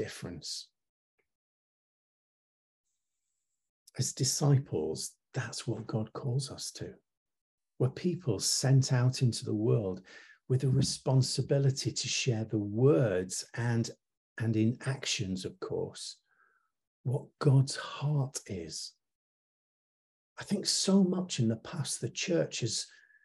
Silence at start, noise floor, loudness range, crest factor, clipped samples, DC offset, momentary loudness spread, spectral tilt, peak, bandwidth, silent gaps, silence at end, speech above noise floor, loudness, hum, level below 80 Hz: 0 s; -87 dBFS; 7 LU; 18 dB; under 0.1%; under 0.1%; 13 LU; -5 dB/octave; -14 dBFS; 12.5 kHz; 0.89-1.18 s, 1.35-2.84 s, 3.69-3.86 s, 7.17-7.26 s, 7.41-7.58 s, 14.17-14.36 s, 16.87-17.04 s, 19.15-20.36 s; 0.35 s; 56 dB; -31 LUFS; none; -68 dBFS